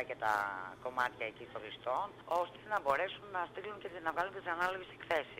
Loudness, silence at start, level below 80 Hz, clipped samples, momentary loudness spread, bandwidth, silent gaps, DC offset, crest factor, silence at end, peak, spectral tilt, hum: -38 LUFS; 0 s; -72 dBFS; under 0.1%; 9 LU; 16 kHz; none; under 0.1%; 22 dB; 0 s; -18 dBFS; -4 dB/octave; none